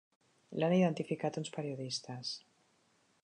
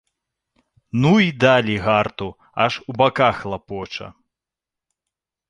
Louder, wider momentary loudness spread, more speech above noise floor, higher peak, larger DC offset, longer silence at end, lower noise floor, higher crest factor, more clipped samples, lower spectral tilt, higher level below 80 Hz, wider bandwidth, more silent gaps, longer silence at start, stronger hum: second, -36 LUFS vs -19 LUFS; second, 12 LU vs 15 LU; second, 38 dB vs 69 dB; second, -20 dBFS vs -2 dBFS; neither; second, 0.85 s vs 1.4 s; second, -73 dBFS vs -87 dBFS; about the same, 18 dB vs 20 dB; neither; about the same, -6 dB/octave vs -6.5 dB/octave; second, -82 dBFS vs -50 dBFS; about the same, 10 kHz vs 10.5 kHz; neither; second, 0.5 s vs 0.95 s; neither